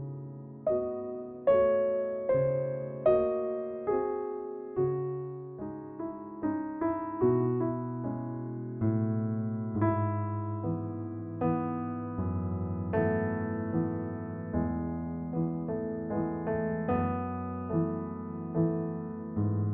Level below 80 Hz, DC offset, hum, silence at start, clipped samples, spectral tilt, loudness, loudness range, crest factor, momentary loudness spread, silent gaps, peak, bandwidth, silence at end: -56 dBFS; under 0.1%; none; 0 s; under 0.1%; -10.5 dB/octave; -32 LUFS; 4 LU; 18 dB; 10 LU; none; -14 dBFS; 3.6 kHz; 0 s